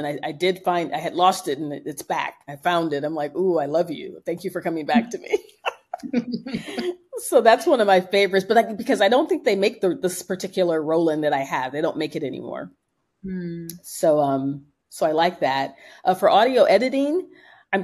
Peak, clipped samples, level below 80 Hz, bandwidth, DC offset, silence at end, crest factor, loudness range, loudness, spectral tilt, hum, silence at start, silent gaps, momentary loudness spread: -2 dBFS; under 0.1%; -66 dBFS; 13 kHz; under 0.1%; 0 s; 20 dB; 7 LU; -22 LUFS; -4.5 dB/octave; none; 0 s; none; 14 LU